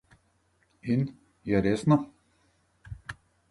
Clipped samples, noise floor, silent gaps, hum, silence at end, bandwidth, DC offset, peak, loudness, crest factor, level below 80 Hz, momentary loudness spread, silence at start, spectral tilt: under 0.1%; -69 dBFS; none; none; 0.4 s; 11.5 kHz; under 0.1%; -10 dBFS; -27 LUFS; 20 dB; -54 dBFS; 20 LU; 0.85 s; -8 dB/octave